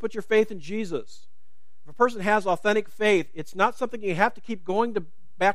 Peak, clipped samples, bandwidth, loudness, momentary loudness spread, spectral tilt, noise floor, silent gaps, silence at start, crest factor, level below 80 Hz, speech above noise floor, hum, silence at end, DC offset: -4 dBFS; under 0.1%; 14 kHz; -25 LUFS; 10 LU; -5 dB/octave; -72 dBFS; none; 0 s; 22 dB; -68 dBFS; 47 dB; none; 0 s; 2%